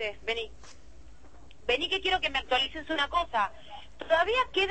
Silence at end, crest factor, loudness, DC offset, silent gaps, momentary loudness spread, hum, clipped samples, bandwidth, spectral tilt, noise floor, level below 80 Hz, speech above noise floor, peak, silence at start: 0 s; 18 dB; -28 LUFS; 0.5%; none; 14 LU; none; under 0.1%; 8.8 kHz; -3 dB/octave; -54 dBFS; -52 dBFS; 25 dB; -12 dBFS; 0 s